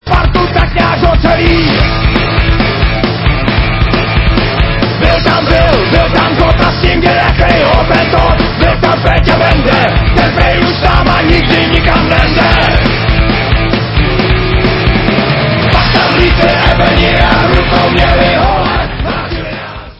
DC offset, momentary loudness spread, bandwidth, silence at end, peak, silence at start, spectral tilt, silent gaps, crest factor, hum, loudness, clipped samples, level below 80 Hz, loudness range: under 0.1%; 3 LU; 8 kHz; 0.05 s; 0 dBFS; 0.05 s; -7.5 dB/octave; none; 8 dB; none; -9 LUFS; 0.5%; -14 dBFS; 2 LU